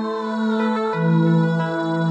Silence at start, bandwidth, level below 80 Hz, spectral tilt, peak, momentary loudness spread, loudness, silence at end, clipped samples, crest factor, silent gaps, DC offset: 0 s; 7.6 kHz; -72 dBFS; -8.5 dB/octave; -6 dBFS; 5 LU; -20 LUFS; 0 s; under 0.1%; 12 dB; none; under 0.1%